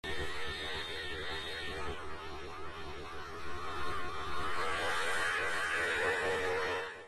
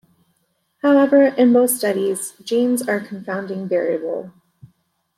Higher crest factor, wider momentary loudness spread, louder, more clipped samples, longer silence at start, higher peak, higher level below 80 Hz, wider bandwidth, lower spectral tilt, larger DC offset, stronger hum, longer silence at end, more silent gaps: about the same, 14 dB vs 16 dB; about the same, 13 LU vs 13 LU; second, -36 LUFS vs -18 LUFS; neither; second, 0.05 s vs 0.85 s; second, -20 dBFS vs -4 dBFS; first, -54 dBFS vs -70 dBFS; second, 13 kHz vs 16 kHz; second, -3 dB/octave vs -4.5 dB/octave; neither; neither; second, 0 s vs 0.9 s; neither